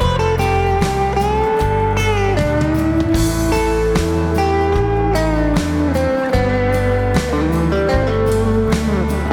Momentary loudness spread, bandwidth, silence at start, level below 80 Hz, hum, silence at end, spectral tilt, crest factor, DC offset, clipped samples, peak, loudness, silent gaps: 1 LU; 18 kHz; 0 s; -24 dBFS; none; 0 s; -6.5 dB/octave; 12 dB; under 0.1%; under 0.1%; -2 dBFS; -16 LUFS; none